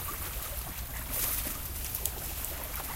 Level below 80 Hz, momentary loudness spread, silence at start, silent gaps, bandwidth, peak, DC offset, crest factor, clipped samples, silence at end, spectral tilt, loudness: -42 dBFS; 7 LU; 0 s; none; 17 kHz; -6 dBFS; under 0.1%; 28 dB; under 0.1%; 0 s; -2.5 dB/octave; -34 LUFS